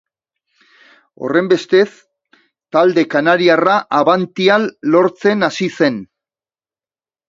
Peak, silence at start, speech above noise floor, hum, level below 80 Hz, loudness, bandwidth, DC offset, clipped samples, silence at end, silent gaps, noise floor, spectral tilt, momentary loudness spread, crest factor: 0 dBFS; 1.2 s; over 76 dB; none; -64 dBFS; -14 LUFS; 7.6 kHz; under 0.1%; under 0.1%; 1.25 s; none; under -90 dBFS; -5.5 dB/octave; 6 LU; 16 dB